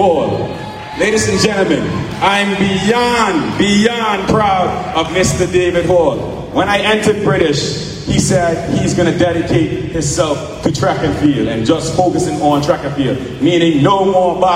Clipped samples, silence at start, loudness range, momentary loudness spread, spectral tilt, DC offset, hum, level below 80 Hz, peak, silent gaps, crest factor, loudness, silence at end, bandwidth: under 0.1%; 0 s; 2 LU; 6 LU; -5 dB/octave; under 0.1%; none; -36 dBFS; 0 dBFS; none; 14 dB; -14 LUFS; 0 s; 15.5 kHz